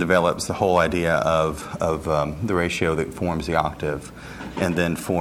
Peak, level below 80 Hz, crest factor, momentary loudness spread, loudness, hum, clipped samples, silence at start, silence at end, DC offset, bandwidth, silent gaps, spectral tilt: -4 dBFS; -42 dBFS; 18 dB; 9 LU; -23 LUFS; none; under 0.1%; 0 s; 0 s; under 0.1%; 16 kHz; none; -5.5 dB/octave